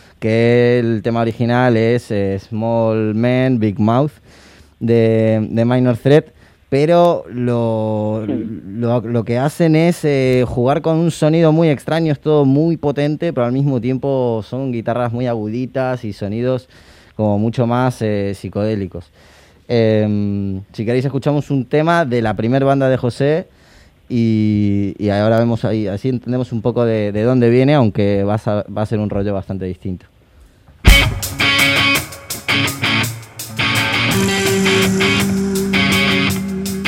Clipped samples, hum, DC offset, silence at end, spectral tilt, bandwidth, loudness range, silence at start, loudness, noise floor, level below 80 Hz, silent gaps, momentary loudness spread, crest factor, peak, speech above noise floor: under 0.1%; none; under 0.1%; 0 s; -6 dB/octave; 16.5 kHz; 5 LU; 0.2 s; -16 LUFS; -47 dBFS; -32 dBFS; none; 9 LU; 16 dB; 0 dBFS; 32 dB